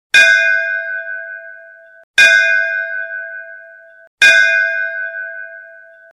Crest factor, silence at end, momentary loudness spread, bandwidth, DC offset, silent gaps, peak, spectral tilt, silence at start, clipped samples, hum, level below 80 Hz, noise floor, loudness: 16 dB; 0.45 s; 22 LU; 14.5 kHz; under 0.1%; 2.04-2.14 s, 4.07-4.18 s; 0 dBFS; 1.5 dB/octave; 0.15 s; under 0.1%; none; -60 dBFS; -39 dBFS; -11 LUFS